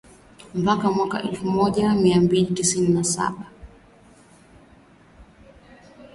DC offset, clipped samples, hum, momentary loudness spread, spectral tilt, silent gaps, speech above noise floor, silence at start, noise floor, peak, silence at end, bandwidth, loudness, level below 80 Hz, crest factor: under 0.1%; under 0.1%; none; 10 LU; -5 dB/octave; none; 31 dB; 0.55 s; -52 dBFS; -6 dBFS; 0.1 s; 11.5 kHz; -21 LUFS; -52 dBFS; 18 dB